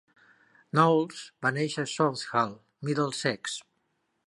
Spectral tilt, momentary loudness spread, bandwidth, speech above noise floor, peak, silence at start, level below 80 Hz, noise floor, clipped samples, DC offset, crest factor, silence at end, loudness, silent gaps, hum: -5 dB/octave; 12 LU; 11.5 kHz; 48 dB; -8 dBFS; 0.75 s; -74 dBFS; -76 dBFS; under 0.1%; under 0.1%; 22 dB; 0.65 s; -28 LUFS; none; none